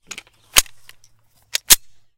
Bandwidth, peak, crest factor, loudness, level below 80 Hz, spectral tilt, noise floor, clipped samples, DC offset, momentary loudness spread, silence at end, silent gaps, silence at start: 17 kHz; 0 dBFS; 22 dB; -15 LUFS; -40 dBFS; 1.5 dB/octave; -55 dBFS; 0.2%; under 0.1%; 23 LU; 0.4 s; none; 0.55 s